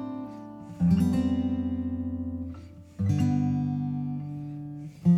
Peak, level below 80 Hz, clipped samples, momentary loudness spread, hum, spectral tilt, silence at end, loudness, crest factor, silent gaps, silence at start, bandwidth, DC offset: -12 dBFS; -50 dBFS; under 0.1%; 16 LU; none; -9 dB/octave; 0 s; -29 LUFS; 16 dB; none; 0 s; 11.5 kHz; under 0.1%